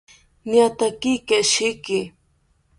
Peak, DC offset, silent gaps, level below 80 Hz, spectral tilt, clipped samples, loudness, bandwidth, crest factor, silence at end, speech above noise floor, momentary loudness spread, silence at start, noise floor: -4 dBFS; under 0.1%; none; -58 dBFS; -2.5 dB/octave; under 0.1%; -20 LUFS; 11.5 kHz; 18 dB; 0.7 s; 43 dB; 10 LU; 0.45 s; -63 dBFS